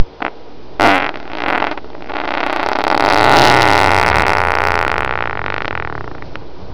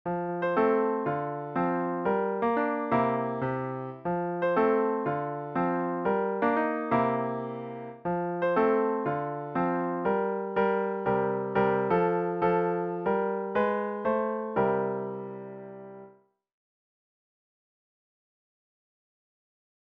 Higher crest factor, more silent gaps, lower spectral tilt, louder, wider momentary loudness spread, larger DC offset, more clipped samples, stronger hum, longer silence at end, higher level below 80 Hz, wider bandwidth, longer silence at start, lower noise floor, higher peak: about the same, 16 dB vs 16 dB; neither; second, -4.5 dB/octave vs -10 dB/octave; first, -14 LUFS vs -28 LUFS; first, 18 LU vs 9 LU; first, 6% vs under 0.1%; first, 0.7% vs under 0.1%; neither; second, 0 s vs 3.9 s; first, -36 dBFS vs -64 dBFS; about the same, 5.4 kHz vs 5.2 kHz; about the same, 0 s vs 0.05 s; second, -35 dBFS vs -58 dBFS; first, 0 dBFS vs -12 dBFS